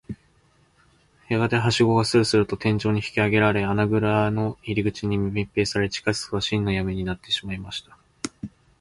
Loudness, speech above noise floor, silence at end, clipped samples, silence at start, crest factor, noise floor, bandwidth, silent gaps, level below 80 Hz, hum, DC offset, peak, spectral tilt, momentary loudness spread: -23 LUFS; 38 dB; 0.3 s; under 0.1%; 0.1 s; 18 dB; -61 dBFS; 11.5 kHz; none; -46 dBFS; none; under 0.1%; -6 dBFS; -5.5 dB/octave; 15 LU